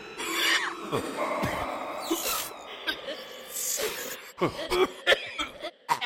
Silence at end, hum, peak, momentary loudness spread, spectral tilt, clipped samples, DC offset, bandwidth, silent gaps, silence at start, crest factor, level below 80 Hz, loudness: 0 s; none; -10 dBFS; 12 LU; -2 dB/octave; under 0.1%; under 0.1%; 17 kHz; none; 0 s; 20 dB; -56 dBFS; -29 LUFS